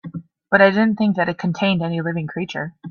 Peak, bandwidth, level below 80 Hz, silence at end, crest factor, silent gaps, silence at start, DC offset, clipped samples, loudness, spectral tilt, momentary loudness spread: 0 dBFS; 7 kHz; -60 dBFS; 0 s; 18 dB; none; 0.05 s; under 0.1%; under 0.1%; -19 LUFS; -7.5 dB/octave; 13 LU